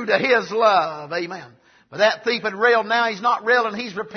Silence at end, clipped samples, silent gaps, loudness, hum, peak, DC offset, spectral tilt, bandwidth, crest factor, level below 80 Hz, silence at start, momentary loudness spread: 0 s; under 0.1%; none; -19 LUFS; none; -4 dBFS; under 0.1%; -4 dB/octave; 6.6 kHz; 16 dB; -70 dBFS; 0 s; 11 LU